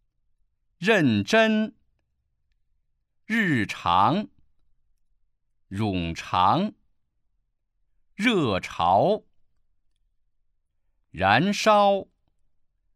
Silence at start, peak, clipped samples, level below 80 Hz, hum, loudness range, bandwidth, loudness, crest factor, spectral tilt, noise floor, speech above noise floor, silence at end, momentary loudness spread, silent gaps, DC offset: 0.8 s; -4 dBFS; under 0.1%; -58 dBFS; none; 4 LU; 14.5 kHz; -23 LUFS; 22 dB; -5.5 dB/octave; -73 dBFS; 51 dB; 0.95 s; 10 LU; none; under 0.1%